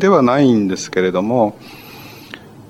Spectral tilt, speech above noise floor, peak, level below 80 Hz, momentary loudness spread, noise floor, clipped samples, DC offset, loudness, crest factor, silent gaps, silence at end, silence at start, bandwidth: -6 dB/octave; 22 dB; -2 dBFS; -56 dBFS; 23 LU; -37 dBFS; under 0.1%; under 0.1%; -15 LUFS; 16 dB; none; 0.1 s; 0 s; 13.5 kHz